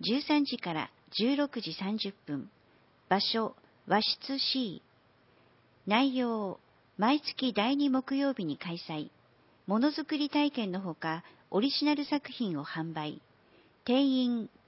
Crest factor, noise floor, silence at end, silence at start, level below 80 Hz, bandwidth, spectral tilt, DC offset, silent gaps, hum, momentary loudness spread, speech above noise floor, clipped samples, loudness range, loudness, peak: 20 dB; -65 dBFS; 0.2 s; 0 s; -78 dBFS; 5.8 kHz; -8.5 dB/octave; under 0.1%; none; none; 12 LU; 34 dB; under 0.1%; 2 LU; -31 LUFS; -12 dBFS